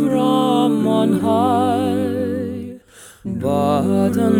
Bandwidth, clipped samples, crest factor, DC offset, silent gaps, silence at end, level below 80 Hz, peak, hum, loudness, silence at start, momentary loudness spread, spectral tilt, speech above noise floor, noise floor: 17 kHz; under 0.1%; 12 dB; under 0.1%; none; 0 s; -54 dBFS; -4 dBFS; none; -18 LUFS; 0 s; 12 LU; -7 dB/octave; 27 dB; -43 dBFS